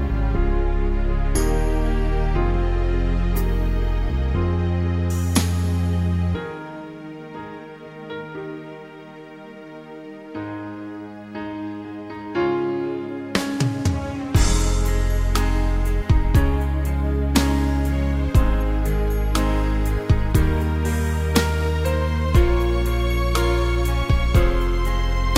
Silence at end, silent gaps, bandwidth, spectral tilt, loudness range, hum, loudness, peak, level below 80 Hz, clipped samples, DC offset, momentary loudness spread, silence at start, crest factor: 0 s; none; 16 kHz; -6 dB/octave; 14 LU; none; -22 LUFS; 0 dBFS; -22 dBFS; under 0.1%; under 0.1%; 15 LU; 0 s; 20 dB